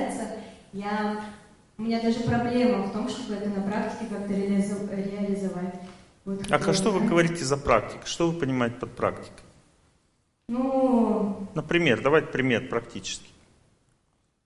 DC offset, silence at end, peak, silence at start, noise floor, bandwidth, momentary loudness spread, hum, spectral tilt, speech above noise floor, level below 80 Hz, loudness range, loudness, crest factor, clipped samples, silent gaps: under 0.1%; 1.2 s; -4 dBFS; 0 s; -70 dBFS; 11.5 kHz; 13 LU; none; -5.5 dB/octave; 44 dB; -52 dBFS; 4 LU; -26 LUFS; 24 dB; under 0.1%; none